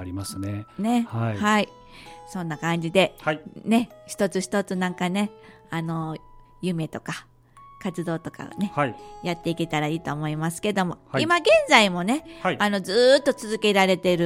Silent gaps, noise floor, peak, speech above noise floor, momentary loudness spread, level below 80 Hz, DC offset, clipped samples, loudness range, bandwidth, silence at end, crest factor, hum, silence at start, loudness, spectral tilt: none; -50 dBFS; 0 dBFS; 26 dB; 15 LU; -56 dBFS; under 0.1%; under 0.1%; 10 LU; 16 kHz; 0 s; 24 dB; none; 0 s; -24 LUFS; -5 dB/octave